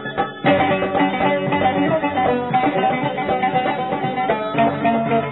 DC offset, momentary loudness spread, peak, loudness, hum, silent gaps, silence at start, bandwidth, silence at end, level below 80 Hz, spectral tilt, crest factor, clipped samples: 0.1%; 4 LU; -2 dBFS; -19 LUFS; none; none; 0 s; 4.1 kHz; 0 s; -52 dBFS; -10 dB/octave; 16 dB; under 0.1%